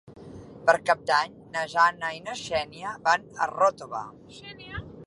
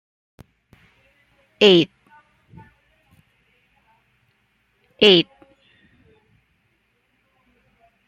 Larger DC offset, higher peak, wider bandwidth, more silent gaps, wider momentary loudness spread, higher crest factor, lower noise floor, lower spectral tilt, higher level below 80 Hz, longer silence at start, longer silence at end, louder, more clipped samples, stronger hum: neither; about the same, -4 dBFS vs -2 dBFS; first, 11.5 kHz vs 8.4 kHz; neither; first, 20 LU vs 12 LU; about the same, 22 dB vs 24 dB; second, -44 dBFS vs -67 dBFS; second, -3 dB/octave vs -5 dB/octave; first, -58 dBFS vs -64 dBFS; second, 0.1 s vs 1.6 s; second, 0 s vs 2.85 s; second, -26 LUFS vs -16 LUFS; neither; neither